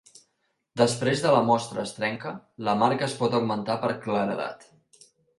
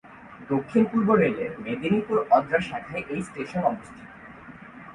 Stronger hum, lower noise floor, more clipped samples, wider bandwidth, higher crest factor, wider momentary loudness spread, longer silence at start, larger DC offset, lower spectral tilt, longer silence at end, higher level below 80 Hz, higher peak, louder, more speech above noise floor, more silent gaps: neither; first, -75 dBFS vs -44 dBFS; neither; about the same, 11.5 kHz vs 10.5 kHz; about the same, 20 dB vs 18 dB; second, 11 LU vs 23 LU; first, 0.75 s vs 0.05 s; neither; second, -5 dB/octave vs -7.5 dB/octave; first, 0.8 s vs 0 s; second, -66 dBFS vs -58 dBFS; about the same, -6 dBFS vs -6 dBFS; about the same, -26 LUFS vs -25 LUFS; first, 50 dB vs 20 dB; neither